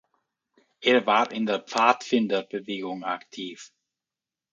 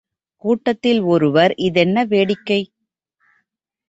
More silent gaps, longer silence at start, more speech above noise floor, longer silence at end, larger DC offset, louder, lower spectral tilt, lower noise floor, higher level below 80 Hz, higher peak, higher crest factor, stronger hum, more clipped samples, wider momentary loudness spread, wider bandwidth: neither; first, 0.8 s vs 0.45 s; first, over 65 dB vs 59 dB; second, 0.85 s vs 1.25 s; neither; second, -25 LUFS vs -17 LUFS; second, -4 dB/octave vs -7 dB/octave; first, under -90 dBFS vs -75 dBFS; second, -78 dBFS vs -60 dBFS; about the same, -2 dBFS vs -2 dBFS; first, 24 dB vs 16 dB; neither; neither; first, 16 LU vs 6 LU; about the same, 7.8 kHz vs 8 kHz